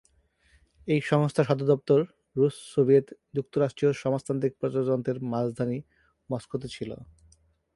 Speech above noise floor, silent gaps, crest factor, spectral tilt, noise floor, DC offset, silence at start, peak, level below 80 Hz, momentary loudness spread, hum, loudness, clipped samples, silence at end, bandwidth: 39 dB; none; 20 dB; -7.5 dB/octave; -65 dBFS; under 0.1%; 0.85 s; -8 dBFS; -62 dBFS; 13 LU; none; -27 LUFS; under 0.1%; 0.7 s; 11.5 kHz